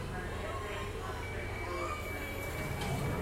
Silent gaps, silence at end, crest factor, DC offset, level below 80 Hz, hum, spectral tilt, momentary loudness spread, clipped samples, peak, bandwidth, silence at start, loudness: none; 0 s; 14 dB; under 0.1%; -46 dBFS; none; -5 dB/octave; 4 LU; under 0.1%; -24 dBFS; 16 kHz; 0 s; -38 LUFS